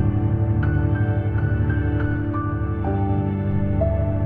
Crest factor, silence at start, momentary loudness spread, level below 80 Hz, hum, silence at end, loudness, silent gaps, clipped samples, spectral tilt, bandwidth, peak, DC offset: 12 dB; 0 s; 3 LU; -30 dBFS; none; 0 s; -22 LUFS; none; under 0.1%; -12 dB/octave; 3.4 kHz; -8 dBFS; under 0.1%